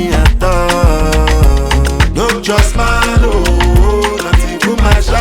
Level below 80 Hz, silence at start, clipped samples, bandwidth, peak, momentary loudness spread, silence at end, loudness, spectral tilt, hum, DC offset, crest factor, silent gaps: -12 dBFS; 0 s; under 0.1%; 16.5 kHz; 0 dBFS; 3 LU; 0 s; -11 LUFS; -5 dB/octave; none; under 0.1%; 10 dB; none